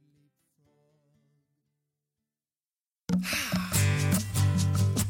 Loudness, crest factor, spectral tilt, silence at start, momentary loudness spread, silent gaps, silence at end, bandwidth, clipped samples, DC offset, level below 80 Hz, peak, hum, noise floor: -27 LUFS; 16 dB; -4.5 dB/octave; 3.1 s; 6 LU; none; 0 s; 17 kHz; under 0.1%; under 0.1%; -52 dBFS; -14 dBFS; none; under -90 dBFS